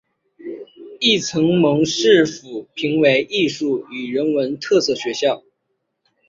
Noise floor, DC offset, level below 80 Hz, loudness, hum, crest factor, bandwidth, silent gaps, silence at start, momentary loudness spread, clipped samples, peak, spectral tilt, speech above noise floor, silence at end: -73 dBFS; under 0.1%; -62 dBFS; -18 LUFS; none; 18 dB; 7.6 kHz; none; 0.4 s; 18 LU; under 0.1%; -2 dBFS; -4.5 dB/octave; 55 dB; 0.9 s